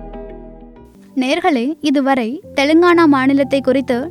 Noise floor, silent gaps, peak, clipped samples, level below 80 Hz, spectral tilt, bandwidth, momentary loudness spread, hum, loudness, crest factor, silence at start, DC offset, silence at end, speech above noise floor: -41 dBFS; none; -2 dBFS; under 0.1%; -44 dBFS; -5 dB/octave; 12.5 kHz; 14 LU; none; -14 LUFS; 12 dB; 0 s; under 0.1%; 0 s; 27 dB